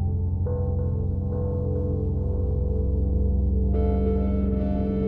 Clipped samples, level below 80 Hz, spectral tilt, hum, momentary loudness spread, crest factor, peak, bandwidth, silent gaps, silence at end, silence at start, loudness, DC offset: under 0.1%; -26 dBFS; -13 dB/octave; none; 3 LU; 10 dB; -14 dBFS; 3.1 kHz; none; 0 s; 0 s; -25 LUFS; under 0.1%